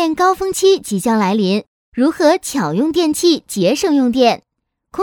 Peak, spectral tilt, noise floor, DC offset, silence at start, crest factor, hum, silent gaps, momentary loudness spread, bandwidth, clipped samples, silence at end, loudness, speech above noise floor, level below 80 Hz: 0 dBFS; -4.5 dB/octave; -45 dBFS; under 0.1%; 0 s; 16 dB; none; 1.68-1.92 s; 5 LU; 18.5 kHz; under 0.1%; 0 s; -15 LUFS; 30 dB; -52 dBFS